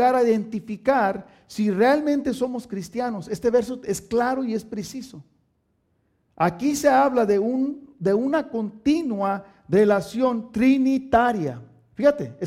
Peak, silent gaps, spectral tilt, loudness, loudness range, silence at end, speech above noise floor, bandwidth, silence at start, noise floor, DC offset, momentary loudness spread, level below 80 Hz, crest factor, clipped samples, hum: -4 dBFS; none; -6 dB/octave; -22 LUFS; 5 LU; 0 s; 47 dB; 15.5 kHz; 0 s; -69 dBFS; under 0.1%; 12 LU; -54 dBFS; 18 dB; under 0.1%; none